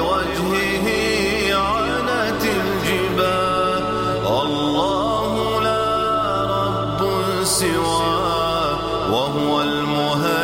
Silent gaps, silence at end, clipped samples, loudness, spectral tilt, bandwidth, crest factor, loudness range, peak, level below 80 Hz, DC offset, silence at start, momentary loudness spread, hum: none; 0 s; under 0.1%; -19 LUFS; -4 dB/octave; 16.5 kHz; 14 dB; 1 LU; -6 dBFS; -40 dBFS; under 0.1%; 0 s; 2 LU; none